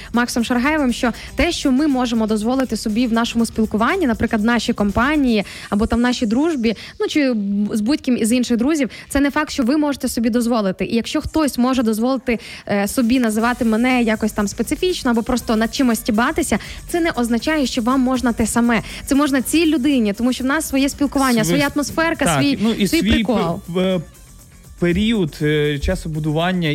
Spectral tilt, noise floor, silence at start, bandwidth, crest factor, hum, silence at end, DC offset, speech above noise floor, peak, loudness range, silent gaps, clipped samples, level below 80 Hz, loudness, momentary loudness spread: -5 dB/octave; -42 dBFS; 0 s; 16.5 kHz; 10 dB; none; 0 s; under 0.1%; 25 dB; -6 dBFS; 2 LU; none; under 0.1%; -36 dBFS; -18 LUFS; 5 LU